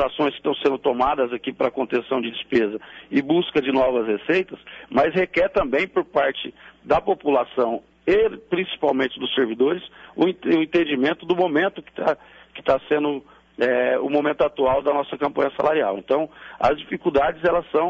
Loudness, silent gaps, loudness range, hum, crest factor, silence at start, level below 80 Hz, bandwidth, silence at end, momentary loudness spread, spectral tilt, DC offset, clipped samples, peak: -22 LUFS; none; 1 LU; none; 14 dB; 0 s; -52 dBFS; 7.4 kHz; 0 s; 6 LU; -7 dB/octave; under 0.1%; under 0.1%; -8 dBFS